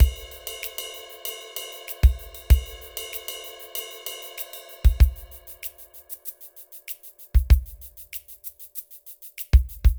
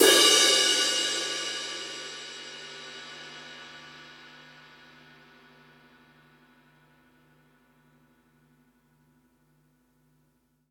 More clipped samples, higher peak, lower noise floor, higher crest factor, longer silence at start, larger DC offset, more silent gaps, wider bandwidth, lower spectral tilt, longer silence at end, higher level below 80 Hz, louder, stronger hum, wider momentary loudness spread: neither; about the same, -4 dBFS vs -6 dBFS; second, -45 dBFS vs -70 dBFS; about the same, 20 dB vs 24 dB; about the same, 0 s vs 0 s; neither; neither; about the same, over 20 kHz vs 19 kHz; first, -4.5 dB/octave vs 0.5 dB/octave; second, 0 s vs 6.65 s; first, -24 dBFS vs -76 dBFS; second, -27 LUFS vs -22 LUFS; second, none vs 50 Hz at -75 dBFS; second, 18 LU vs 29 LU